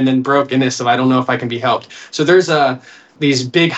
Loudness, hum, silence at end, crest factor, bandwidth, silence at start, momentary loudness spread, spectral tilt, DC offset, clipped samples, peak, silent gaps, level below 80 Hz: -15 LUFS; none; 0 s; 14 dB; 8.4 kHz; 0 s; 7 LU; -5 dB/octave; under 0.1%; under 0.1%; 0 dBFS; none; -64 dBFS